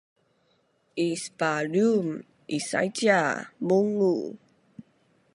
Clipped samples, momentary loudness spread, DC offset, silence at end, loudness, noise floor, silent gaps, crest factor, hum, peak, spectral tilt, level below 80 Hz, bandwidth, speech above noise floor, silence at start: under 0.1%; 11 LU; under 0.1%; 0.55 s; -26 LUFS; -68 dBFS; none; 20 dB; none; -8 dBFS; -5 dB/octave; -74 dBFS; 11.5 kHz; 43 dB; 0.95 s